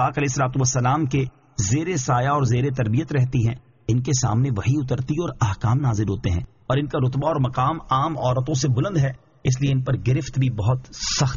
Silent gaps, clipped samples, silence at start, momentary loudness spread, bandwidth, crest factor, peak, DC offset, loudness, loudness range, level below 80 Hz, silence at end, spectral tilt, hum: none; under 0.1%; 0 s; 5 LU; 7.4 kHz; 14 dB; -8 dBFS; under 0.1%; -22 LUFS; 1 LU; -42 dBFS; 0 s; -6.5 dB/octave; none